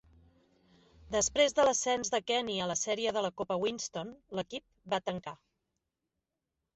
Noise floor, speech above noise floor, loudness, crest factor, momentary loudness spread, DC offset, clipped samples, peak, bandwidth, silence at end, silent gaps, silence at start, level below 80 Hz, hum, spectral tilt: -87 dBFS; 55 dB; -32 LUFS; 20 dB; 14 LU; under 0.1%; under 0.1%; -14 dBFS; 8.2 kHz; 1.4 s; none; 1.05 s; -64 dBFS; none; -2.5 dB/octave